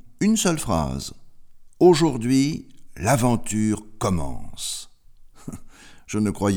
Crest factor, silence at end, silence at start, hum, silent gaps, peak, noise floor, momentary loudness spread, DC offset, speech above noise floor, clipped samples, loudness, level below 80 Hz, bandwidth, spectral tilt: 18 dB; 0 s; 0.05 s; none; none; -4 dBFS; -46 dBFS; 18 LU; under 0.1%; 25 dB; under 0.1%; -22 LUFS; -42 dBFS; over 20 kHz; -5.5 dB/octave